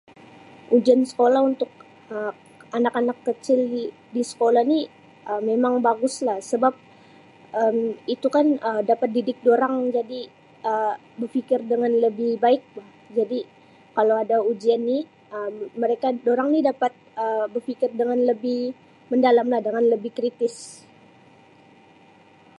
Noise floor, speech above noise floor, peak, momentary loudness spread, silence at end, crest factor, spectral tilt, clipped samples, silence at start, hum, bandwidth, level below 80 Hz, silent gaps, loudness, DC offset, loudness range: -52 dBFS; 31 dB; -4 dBFS; 12 LU; 1.85 s; 18 dB; -5 dB/octave; under 0.1%; 0.7 s; none; 11.5 kHz; -78 dBFS; none; -22 LUFS; under 0.1%; 2 LU